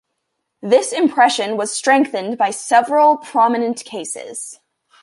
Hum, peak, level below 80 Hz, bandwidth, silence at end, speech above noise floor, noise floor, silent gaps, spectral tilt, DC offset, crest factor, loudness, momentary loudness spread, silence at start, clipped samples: none; -2 dBFS; -72 dBFS; 11.5 kHz; 0.5 s; 58 dB; -74 dBFS; none; -2.5 dB/octave; under 0.1%; 16 dB; -16 LUFS; 13 LU; 0.65 s; under 0.1%